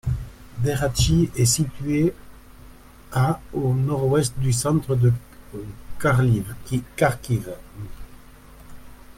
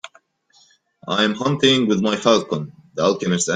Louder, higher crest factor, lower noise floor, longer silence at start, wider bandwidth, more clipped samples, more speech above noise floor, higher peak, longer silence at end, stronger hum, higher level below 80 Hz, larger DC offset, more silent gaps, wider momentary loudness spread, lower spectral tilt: second, -22 LUFS vs -19 LUFS; about the same, 18 dB vs 18 dB; second, -45 dBFS vs -57 dBFS; about the same, 0.05 s vs 0.05 s; first, 16 kHz vs 9.6 kHz; neither; second, 24 dB vs 39 dB; second, -6 dBFS vs -2 dBFS; about the same, 0.05 s vs 0 s; neither; first, -38 dBFS vs -60 dBFS; neither; neither; first, 18 LU vs 12 LU; first, -5.5 dB/octave vs -4 dB/octave